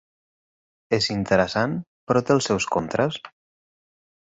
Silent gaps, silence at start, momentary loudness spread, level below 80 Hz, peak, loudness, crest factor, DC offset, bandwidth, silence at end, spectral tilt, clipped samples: 1.87-2.07 s; 0.9 s; 6 LU; -54 dBFS; -6 dBFS; -23 LUFS; 20 dB; under 0.1%; 8.4 kHz; 1.05 s; -5 dB/octave; under 0.1%